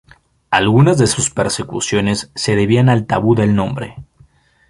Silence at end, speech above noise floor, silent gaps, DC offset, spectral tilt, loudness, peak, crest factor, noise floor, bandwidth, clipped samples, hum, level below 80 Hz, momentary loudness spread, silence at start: 0.65 s; 36 dB; none; under 0.1%; -5 dB/octave; -15 LUFS; -2 dBFS; 14 dB; -50 dBFS; 11.5 kHz; under 0.1%; none; -42 dBFS; 8 LU; 0.5 s